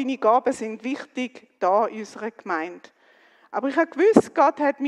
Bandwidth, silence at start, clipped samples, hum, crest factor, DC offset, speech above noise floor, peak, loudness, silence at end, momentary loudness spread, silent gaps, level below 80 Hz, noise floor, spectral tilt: 11.5 kHz; 0 s; under 0.1%; none; 24 dB; under 0.1%; 34 dB; 0 dBFS; -23 LUFS; 0 s; 15 LU; none; -68 dBFS; -56 dBFS; -5.5 dB/octave